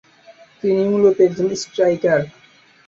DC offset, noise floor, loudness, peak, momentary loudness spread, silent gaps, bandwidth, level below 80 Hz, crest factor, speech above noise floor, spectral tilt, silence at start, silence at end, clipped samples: under 0.1%; -47 dBFS; -17 LUFS; -4 dBFS; 8 LU; none; 7.8 kHz; -60 dBFS; 16 dB; 31 dB; -6 dB/octave; 0.3 s; 0.6 s; under 0.1%